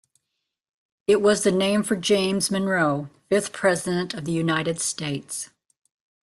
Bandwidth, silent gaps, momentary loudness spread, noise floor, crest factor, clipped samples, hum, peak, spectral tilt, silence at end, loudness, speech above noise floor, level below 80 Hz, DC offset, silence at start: 12.5 kHz; none; 10 LU; -81 dBFS; 18 dB; under 0.1%; none; -6 dBFS; -4 dB/octave; 0.8 s; -23 LUFS; 58 dB; -62 dBFS; under 0.1%; 1.1 s